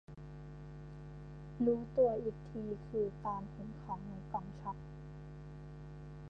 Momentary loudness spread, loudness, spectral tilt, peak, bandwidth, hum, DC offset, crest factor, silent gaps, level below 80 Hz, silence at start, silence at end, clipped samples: 18 LU; -39 LUFS; -10 dB/octave; -20 dBFS; 7.4 kHz; none; under 0.1%; 20 dB; none; -56 dBFS; 0.1 s; 0 s; under 0.1%